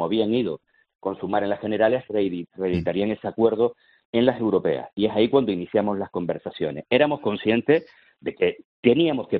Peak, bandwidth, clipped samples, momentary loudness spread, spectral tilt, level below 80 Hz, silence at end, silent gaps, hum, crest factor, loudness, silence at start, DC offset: -4 dBFS; 5.2 kHz; under 0.1%; 9 LU; -5 dB/octave; -60 dBFS; 0 s; 0.95-0.99 s, 4.05-4.13 s, 8.65-8.83 s; none; 20 dB; -23 LUFS; 0 s; under 0.1%